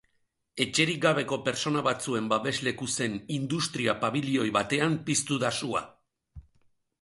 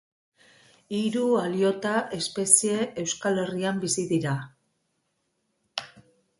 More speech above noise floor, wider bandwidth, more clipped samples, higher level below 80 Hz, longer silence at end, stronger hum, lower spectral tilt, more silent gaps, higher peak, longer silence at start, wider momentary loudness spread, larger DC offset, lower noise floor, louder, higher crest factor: second, 46 dB vs 50 dB; about the same, 11.5 kHz vs 12 kHz; neither; first, -62 dBFS vs -68 dBFS; first, 0.6 s vs 0.4 s; neither; about the same, -4 dB/octave vs -3.5 dB/octave; neither; second, -8 dBFS vs -2 dBFS; second, 0.55 s vs 0.9 s; second, 6 LU vs 14 LU; neither; about the same, -74 dBFS vs -75 dBFS; second, -28 LUFS vs -25 LUFS; second, 20 dB vs 26 dB